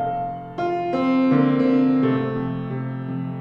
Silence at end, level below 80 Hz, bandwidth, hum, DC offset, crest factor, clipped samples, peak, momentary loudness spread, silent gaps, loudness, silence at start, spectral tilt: 0 s; -54 dBFS; 5.4 kHz; none; under 0.1%; 14 dB; under 0.1%; -6 dBFS; 10 LU; none; -21 LUFS; 0 s; -9.5 dB/octave